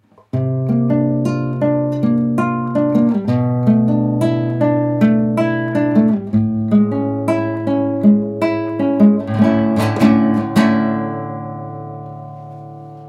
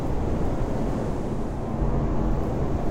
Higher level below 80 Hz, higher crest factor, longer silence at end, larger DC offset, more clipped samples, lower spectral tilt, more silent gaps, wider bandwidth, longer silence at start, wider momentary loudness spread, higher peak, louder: second, -52 dBFS vs -30 dBFS; about the same, 16 dB vs 12 dB; about the same, 0 s vs 0 s; second, under 0.1% vs 0.7%; neither; about the same, -8.5 dB/octave vs -8.5 dB/octave; neither; first, 11.5 kHz vs 10 kHz; first, 0.35 s vs 0 s; first, 14 LU vs 4 LU; first, 0 dBFS vs -12 dBFS; first, -16 LUFS vs -28 LUFS